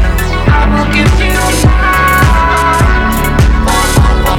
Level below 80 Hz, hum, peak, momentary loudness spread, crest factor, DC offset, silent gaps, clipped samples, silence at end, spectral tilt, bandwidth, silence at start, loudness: -12 dBFS; none; 0 dBFS; 3 LU; 8 dB; under 0.1%; none; under 0.1%; 0 s; -5 dB/octave; 18.5 kHz; 0 s; -9 LUFS